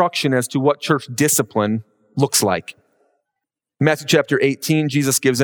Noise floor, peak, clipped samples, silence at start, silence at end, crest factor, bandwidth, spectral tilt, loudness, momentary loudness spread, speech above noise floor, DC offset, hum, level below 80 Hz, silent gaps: -83 dBFS; -2 dBFS; under 0.1%; 0 s; 0 s; 18 dB; over 20 kHz; -4 dB/octave; -18 LUFS; 6 LU; 65 dB; under 0.1%; none; -66 dBFS; none